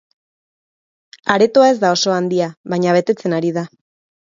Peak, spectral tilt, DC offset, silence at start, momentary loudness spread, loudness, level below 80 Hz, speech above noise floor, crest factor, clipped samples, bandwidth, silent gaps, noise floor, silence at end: 0 dBFS; -5 dB/octave; under 0.1%; 1.25 s; 11 LU; -16 LUFS; -64 dBFS; over 75 dB; 18 dB; under 0.1%; 7.6 kHz; 2.57-2.64 s; under -90 dBFS; 0.65 s